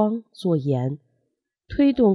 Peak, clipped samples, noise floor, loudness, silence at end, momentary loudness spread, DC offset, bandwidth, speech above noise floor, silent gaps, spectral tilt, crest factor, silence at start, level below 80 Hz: -8 dBFS; under 0.1%; -76 dBFS; -23 LUFS; 0 s; 11 LU; under 0.1%; 11 kHz; 55 dB; none; -9 dB/octave; 14 dB; 0 s; -50 dBFS